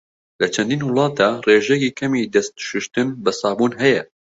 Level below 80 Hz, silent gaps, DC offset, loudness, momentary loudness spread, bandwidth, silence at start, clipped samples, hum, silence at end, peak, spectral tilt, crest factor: -60 dBFS; none; under 0.1%; -19 LUFS; 8 LU; 8 kHz; 0.4 s; under 0.1%; none; 0.25 s; -2 dBFS; -4.5 dB/octave; 18 dB